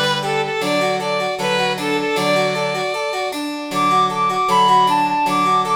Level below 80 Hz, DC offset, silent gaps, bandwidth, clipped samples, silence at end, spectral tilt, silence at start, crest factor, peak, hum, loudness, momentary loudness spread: -58 dBFS; under 0.1%; none; over 20 kHz; under 0.1%; 0 s; -4 dB/octave; 0 s; 14 dB; -4 dBFS; none; -17 LUFS; 7 LU